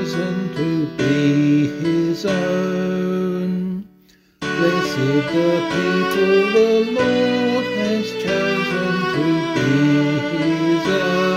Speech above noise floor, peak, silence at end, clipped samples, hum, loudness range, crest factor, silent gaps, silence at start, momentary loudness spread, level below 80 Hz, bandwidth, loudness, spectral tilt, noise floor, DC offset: 35 dB; -4 dBFS; 0 s; under 0.1%; none; 4 LU; 14 dB; none; 0 s; 6 LU; -54 dBFS; 15.5 kHz; -18 LUFS; -6.5 dB/octave; -53 dBFS; under 0.1%